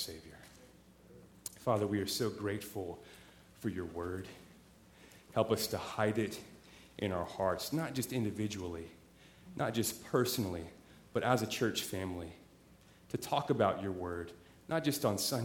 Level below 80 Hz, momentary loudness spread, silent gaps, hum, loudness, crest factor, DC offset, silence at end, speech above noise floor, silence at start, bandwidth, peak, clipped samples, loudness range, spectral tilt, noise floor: -64 dBFS; 19 LU; none; none; -36 LUFS; 24 dB; under 0.1%; 0 s; 26 dB; 0 s; 18.5 kHz; -14 dBFS; under 0.1%; 4 LU; -4.5 dB/octave; -61 dBFS